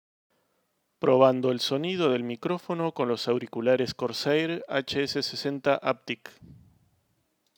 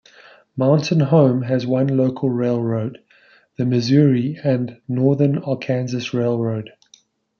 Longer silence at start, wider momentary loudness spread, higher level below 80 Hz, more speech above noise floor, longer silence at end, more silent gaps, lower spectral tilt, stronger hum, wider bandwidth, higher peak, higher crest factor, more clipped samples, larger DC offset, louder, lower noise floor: first, 1 s vs 0.55 s; about the same, 9 LU vs 10 LU; second, -70 dBFS vs -64 dBFS; first, 48 dB vs 37 dB; first, 1.05 s vs 0.7 s; neither; second, -5.5 dB/octave vs -8 dB/octave; neither; first, 20 kHz vs 7 kHz; second, -6 dBFS vs -2 dBFS; first, 22 dB vs 16 dB; neither; neither; second, -27 LUFS vs -19 LUFS; first, -74 dBFS vs -55 dBFS